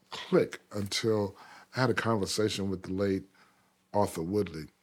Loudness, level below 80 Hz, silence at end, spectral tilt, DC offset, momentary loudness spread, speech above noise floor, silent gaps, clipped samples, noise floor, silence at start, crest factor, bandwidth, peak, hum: -31 LUFS; -64 dBFS; 0.15 s; -5 dB/octave; under 0.1%; 8 LU; 37 dB; none; under 0.1%; -67 dBFS; 0.1 s; 20 dB; 18 kHz; -10 dBFS; none